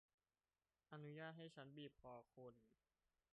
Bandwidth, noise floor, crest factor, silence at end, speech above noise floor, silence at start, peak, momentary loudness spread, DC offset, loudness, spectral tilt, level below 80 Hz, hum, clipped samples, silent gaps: 4.5 kHz; under -90 dBFS; 18 dB; 0.6 s; over 30 dB; 0.9 s; -44 dBFS; 9 LU; under 0.1%; -60 LUFS; -4.5 dB/octave; -90 dBFS; none; under 0.1%; none